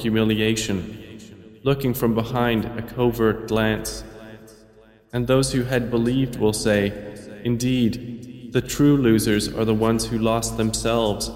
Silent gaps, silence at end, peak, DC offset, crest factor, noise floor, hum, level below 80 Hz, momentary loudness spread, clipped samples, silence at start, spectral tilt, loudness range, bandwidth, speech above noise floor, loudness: none; 0 s; -6 dBFS; under 0.1%; 16 dB; -51 dBFS; none; -42 dBFS; 16 LU; under 0.1%; 0 s; -5.5 dB/octave; 3 LU; 16 kHz; 30 dB; -22 LUFS